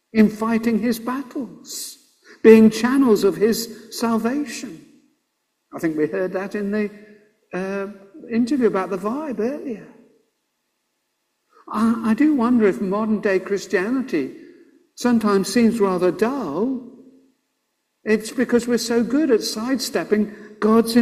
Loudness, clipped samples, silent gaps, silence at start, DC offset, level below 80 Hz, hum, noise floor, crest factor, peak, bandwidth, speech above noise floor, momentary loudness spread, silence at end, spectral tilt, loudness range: -20 LUFS; under 0.1%; none; 0.15 s; under 0.1%; -60 dBFS; none; -73 dBFS; 20 dB; 0 dBFS; 15.5 kHz; 54 dB; 14 LU; 0 s; -5.5 dB/octave; 8 LU